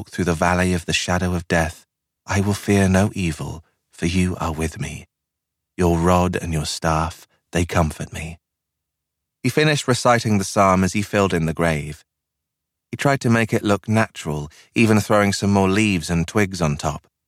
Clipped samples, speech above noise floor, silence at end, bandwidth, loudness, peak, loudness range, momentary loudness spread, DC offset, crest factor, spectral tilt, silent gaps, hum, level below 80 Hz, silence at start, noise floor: under 0.1%; 62 dB; 0.3 s; 15.5 kHz; -20 LUFS; -4 dBFS; 4 LU; 11 LU; under 0.1%; 18 dB; -5.5 dB/octave; none; none; -40 dBFS; 0 s; -81 dBFS